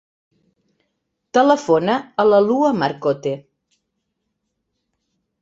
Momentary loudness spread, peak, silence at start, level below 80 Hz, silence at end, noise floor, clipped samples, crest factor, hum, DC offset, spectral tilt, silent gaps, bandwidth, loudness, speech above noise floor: 9 LU; -2 dBFS; 1.35 s; -64 dBFS; 2.05 s; -75 dBFS; under 0.1%; 18 dB; none; under 0.1%; -6 dB/octave; none; 7.8 kHz; -17 LUFS; 58 dB